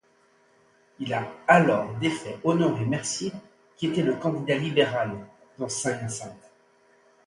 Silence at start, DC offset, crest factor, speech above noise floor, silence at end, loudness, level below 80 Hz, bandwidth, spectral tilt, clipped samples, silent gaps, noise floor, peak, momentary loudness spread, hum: 1 s; under 0.1%; 22 dB; 37 dB; 0.9 s; -26 LUFS; -64 dBFS; 11.5 kHz; -5 dB/octave; under 0.1%; none; -62 dBFS; -4 dBFS; 16 LU; none